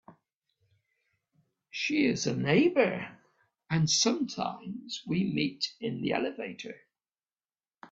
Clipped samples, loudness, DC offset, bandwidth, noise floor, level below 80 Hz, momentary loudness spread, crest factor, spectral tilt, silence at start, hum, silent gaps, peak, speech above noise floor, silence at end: under 0.1%; -29 LUFS; under 0.1%; 8 kHz; under -90 dBFS; -68 dBFS; 15 LU; 22 dB; -4.5 dB/octave; 0.1 s; none; 0.35-0.41 s; -10 dBFS; over 61 dB; 0.05 s